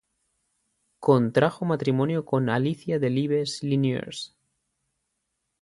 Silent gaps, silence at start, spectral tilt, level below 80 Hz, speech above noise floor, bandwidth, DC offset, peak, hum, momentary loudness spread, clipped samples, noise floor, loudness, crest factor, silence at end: none; 1 s; -7 dB/octave; -66 dBFS; 55 dB; 11.5 kHz; under 0.1%; -6 dBFS; none; 8 LU; under 0.1%; -79 dBFS; -25 LUFS; 20 dB; 1.35 s